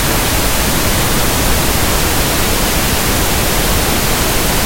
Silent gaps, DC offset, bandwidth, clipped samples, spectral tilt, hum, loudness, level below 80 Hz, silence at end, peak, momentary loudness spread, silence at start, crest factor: none; under 0.1%; 16.5 kHz; under 0.1%; -3 dB/octave; none; -13 LUFS; -20 dBFS; 0 s; 0 dBFS; 0 LU; 0 s; 12 dB